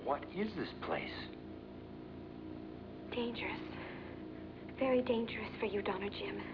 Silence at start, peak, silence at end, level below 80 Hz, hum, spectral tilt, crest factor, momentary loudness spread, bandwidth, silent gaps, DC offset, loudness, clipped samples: 0 s; -22 dBFS; 0 s; -62 dBFS; none; -4 dB/octave; 18 dB; 15 LU; 5.4 kHz; none; under 0.1%; -41 LUFS; under 0.1%